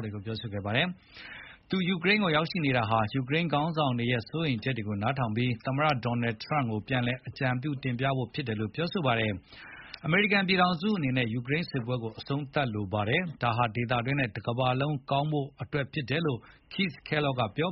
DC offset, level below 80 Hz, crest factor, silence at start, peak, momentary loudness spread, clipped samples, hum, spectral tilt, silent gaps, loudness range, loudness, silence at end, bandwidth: under 0.1%; -58 dBFS; 18 dB; 0 s; -10 dBFS; 9 LU; under 0.1%; none; -4.5 dB/octave; none; 3 LU; -29 LUFS; 0 s; 5.8 kHz